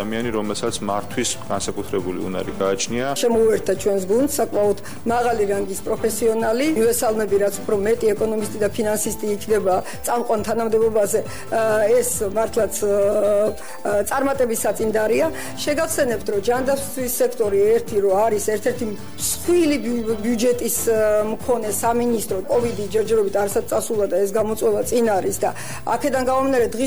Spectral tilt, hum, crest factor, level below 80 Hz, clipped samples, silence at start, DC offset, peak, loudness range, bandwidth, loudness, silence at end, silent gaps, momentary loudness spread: -4 dB/octave; none; 12 dB; -46 dBFS; under 0.1%; 0 s; 2%; -8 dBFS; 1 LU; over 20 kHz; -20 LUFS; 0 s; none; 6 LU